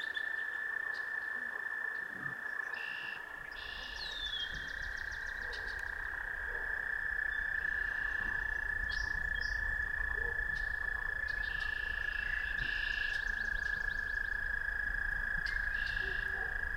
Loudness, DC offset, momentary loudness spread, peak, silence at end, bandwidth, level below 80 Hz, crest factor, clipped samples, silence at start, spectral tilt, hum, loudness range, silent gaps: -36 LUFS; under 0.1%; 5 LU; -24 dBFS; 0 s; 16.5 kHz; -48 dBFS; 14 dB; under 0.1%; 0 s; -3 dB/octave; none; 4 LU; none